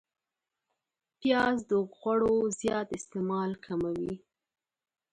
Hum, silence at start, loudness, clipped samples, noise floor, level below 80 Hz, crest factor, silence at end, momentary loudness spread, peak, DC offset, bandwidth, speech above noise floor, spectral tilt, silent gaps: none; 1.2 s; -30 LUFS; under 0.1%; -89 dBFS; -62 dBFS; 18 dB; 0.95 s; 9 LU; -14 dBFS; under 0.1%; 11 kHz; 59 dB; -5 dB/octave; none